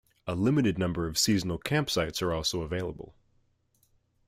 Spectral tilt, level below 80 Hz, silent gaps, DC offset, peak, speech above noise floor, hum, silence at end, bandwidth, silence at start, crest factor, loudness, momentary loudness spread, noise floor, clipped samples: -4.5 dB/octave; -52 dBFS; none; under 0.1%; -12 dBFS; 41 dB; none; 1.15 s; 16 kHz; 0.25 s; 18 dB; -29 LUFS; 11 LU; -70 dBFS; under 0.1%